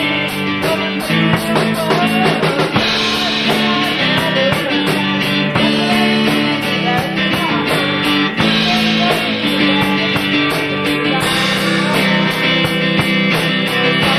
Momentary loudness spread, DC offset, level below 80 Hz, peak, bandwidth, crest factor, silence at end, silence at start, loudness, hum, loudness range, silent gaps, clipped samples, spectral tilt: 3 LU; 0.2%; -44 dBFS; -2 dBFS; 15.5 kHz; 12 dB; 0 s; 0 s; -14 LUFS; none; 1 LU; none; under 0.1%; -4.5 dB/octave